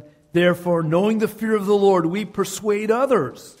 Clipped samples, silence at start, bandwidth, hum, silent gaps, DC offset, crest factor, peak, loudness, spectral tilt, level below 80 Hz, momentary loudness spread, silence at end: under 0.1%; 0.35 s; 16 kHz; none; none; under 0.1%; 16 dB; -4 dBFS; -20 LUFS; -6 dB/octave; -60 dBFS; 7 LU; 0.1 s